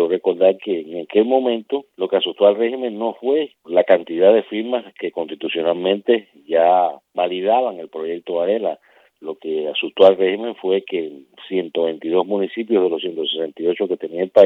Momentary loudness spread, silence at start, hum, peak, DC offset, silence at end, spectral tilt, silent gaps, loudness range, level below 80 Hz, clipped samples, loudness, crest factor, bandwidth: 12 LU; 0 s; none; 0 dBFS; under 0.1%; 0 s; -7 dB/octave; none; 3 LU; -76 dBFS; under 0.1%; -19 LUFS; 18 dB; 4.6 kHz